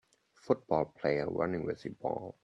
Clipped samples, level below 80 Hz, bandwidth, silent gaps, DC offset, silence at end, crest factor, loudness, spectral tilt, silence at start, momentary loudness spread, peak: under 0.1%; -66 dBFS; 8.2 kHz; none; under 0.1%; 0.15 s; 20 dB; -34 LUFS; -8 dB/octave; 0.45 s; 7 LU; -14 dBFS